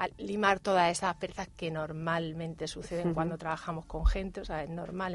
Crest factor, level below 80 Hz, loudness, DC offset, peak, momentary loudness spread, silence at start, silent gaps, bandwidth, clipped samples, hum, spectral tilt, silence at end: 22 dB; -40 dBFS; -33 LUFS; under 0.1%; -12 dBFS; 11 LU; 0 s; none; 11.5 kHz; under 0.1%; none; -5 dB/octave; 0 s